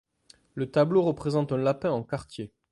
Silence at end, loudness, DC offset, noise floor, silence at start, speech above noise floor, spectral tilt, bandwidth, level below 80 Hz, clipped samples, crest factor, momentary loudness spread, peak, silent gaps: 0.25 s; -27 LUFS; under 0.1%; -60 dBFS; 0.55 s; 34 dB; -8 dB/octave; 11.5 kHz; -60 dBFS; under 0.1%; 18 dB; 17 LU; -10 dBFS; none